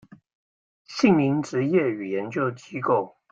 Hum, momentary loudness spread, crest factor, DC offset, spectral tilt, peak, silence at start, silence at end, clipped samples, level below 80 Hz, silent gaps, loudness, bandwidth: none; 9 LU; 18 dB; under 0.1%; -7 dB/octave; -6 dBFS; 0.9 s; 0.25 s; under 0.1%; -66 dBFS; none; -24 LUFS; 8 kHz